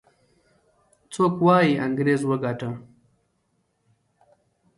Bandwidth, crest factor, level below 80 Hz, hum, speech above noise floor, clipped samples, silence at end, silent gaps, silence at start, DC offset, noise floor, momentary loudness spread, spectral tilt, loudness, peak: 11.5 kHz; 18 dB; -66 dBFS; none; 50 dB; under 0.1%; 1.95 s; none; 1.1 s; under 0.1%; -71 dBFS; 16 LU; -7 dB/octave; -22 LUFS; -6 dBFS